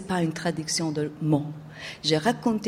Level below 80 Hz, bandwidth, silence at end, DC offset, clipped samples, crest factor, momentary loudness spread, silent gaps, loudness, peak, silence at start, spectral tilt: -60 dBFS; 15.5 kHz; 0 s; under 0.1%; under 0.1%; 18 dB; 12 LU; none; -26 LUFS; -10 dBFS; 0 s; -4.5 dB/octave